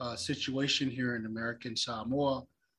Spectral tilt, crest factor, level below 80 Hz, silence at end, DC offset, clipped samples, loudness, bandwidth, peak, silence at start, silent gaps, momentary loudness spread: -4 dB/octave; 16 dB; -62 dBFS; 0.35 s; under 0.1%; under 0.1%; -33 LUFS; 12 kHz; -18 dBFS; 0 s; none; 7 LU